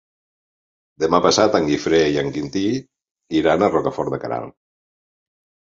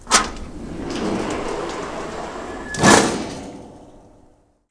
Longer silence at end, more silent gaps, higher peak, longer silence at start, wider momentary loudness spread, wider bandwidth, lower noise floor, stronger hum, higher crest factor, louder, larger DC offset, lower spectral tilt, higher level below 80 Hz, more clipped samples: first, 1.25 s vs 0.7 s; first, 3.11-3.15 s vs none; about the same, -2 dBFS vs 0 dBFS; first, 1 s vs 0 s; second, 11 LU vs 20 LU; second, 7.6 kHz vs 11 kHz; first, under -90 dBFS vs -54 dBFS; neither; about the same, 20 dB vs 22 dB; about the same, -19 LUFS vs -20 LUFS; neither; first, -4.5 dB/octave vs -3 dB/octave; second, -50 dBFS vs -40 dBFS; neither